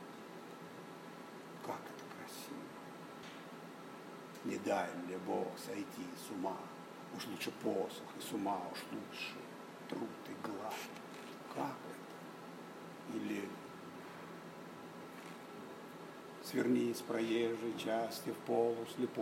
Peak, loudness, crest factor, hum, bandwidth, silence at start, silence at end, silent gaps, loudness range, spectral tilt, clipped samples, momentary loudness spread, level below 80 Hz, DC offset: -20 dBFS; -43 LUFS; 22 dB; none; 16 kHz; 0 s; 0 s; none; 10 LU; -5 dB/octave; under 0.1%; 15 LU; -88 dBFS; under 0.1%